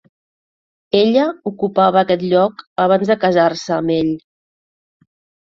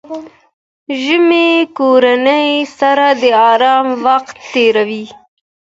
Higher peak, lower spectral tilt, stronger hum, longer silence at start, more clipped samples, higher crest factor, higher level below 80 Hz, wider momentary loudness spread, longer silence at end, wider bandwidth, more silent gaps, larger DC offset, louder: about the same, -2 dBFS vs 0 dBFS; first, -6.5 dB/octave vs -4 dB/octave; neither; first, 0.95 s vs 0.1 s; neither; about the same, 16 dB vs 12 dB; about the same, -58 dBFS vs -62 dBFS; second, 7 LU vs 12 LU; first, 1.25 s vs 0.65 s; about the same, 7.6 kHz vs 7.8 kHz; second, 2.67-2.76 s vs 0.53-0.86 s; neither; second, -16 LUFS vs -11 LUFS